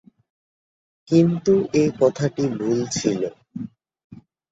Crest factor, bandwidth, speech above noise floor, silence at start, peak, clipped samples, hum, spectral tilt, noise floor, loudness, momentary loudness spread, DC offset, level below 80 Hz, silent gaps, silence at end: 18 dB; 8 kHz; over 70 dB; 1.1 s; -4 dBFS; under 0.1%; none; -6.5 dB/octave; under -90 dBFS; -21 LUFS; 17 LU; under 0.1%; -58 dBFS; 4.04-4.10 s; 0.3 s